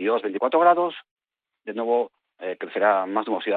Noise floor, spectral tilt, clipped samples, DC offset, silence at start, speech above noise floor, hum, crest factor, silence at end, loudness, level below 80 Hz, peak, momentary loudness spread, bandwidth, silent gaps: -79 dBFS; -8.5 dB/octave; under 0.1%; under 0.1%; 0 s; 56 dB; none; 18 dB; 0 s; -23 LUFS; -78 dBFS; -6 dBFS; 16 LU; 4.5 kHz; 1.11-1.16 s